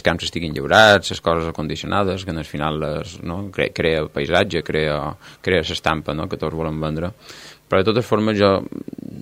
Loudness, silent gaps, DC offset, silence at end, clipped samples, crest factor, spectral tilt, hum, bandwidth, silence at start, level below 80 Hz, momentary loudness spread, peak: -20 LUFS; none; under 0.1%; 0 s; under 0.1%; 20 dB; -5 dB/octave; none; 16 kHz; 0.05 s; -42 dBFS; 13 LU; 0 dBFS